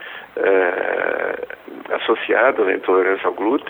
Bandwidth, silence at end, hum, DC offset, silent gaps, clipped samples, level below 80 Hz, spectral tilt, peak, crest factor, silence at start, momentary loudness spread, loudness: 4 kHz; 0 s; none; under 0.1%; none; under 0.1%; -66 dBFS; -6.5 dB/octave; -2 dBFS; 18 dB; 0 s; 13 LU; -18 LUFS